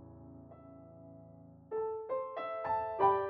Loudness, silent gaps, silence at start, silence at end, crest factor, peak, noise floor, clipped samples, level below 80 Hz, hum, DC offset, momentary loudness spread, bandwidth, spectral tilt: -36 LUFS; none; 0 s; 0 s; 22 dB; -16 dBFS; -56 dBFS; under 0.1%; -70 dBFS; none; under 0.1%; 22 LU; 4.8 kHz; -5 dB/octave